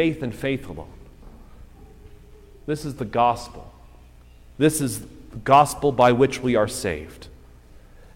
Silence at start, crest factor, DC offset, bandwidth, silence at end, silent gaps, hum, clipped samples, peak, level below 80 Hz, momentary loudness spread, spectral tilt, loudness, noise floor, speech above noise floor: 0 s; 20 dB; under 0.1%; 16.5 kHz; 0.4 s; none; none; under 0.1%; -4 dBFS; -46 dBFS; 22 LU; -5 dB/octave; -22 LUFS; -48 dBFS; 26 dB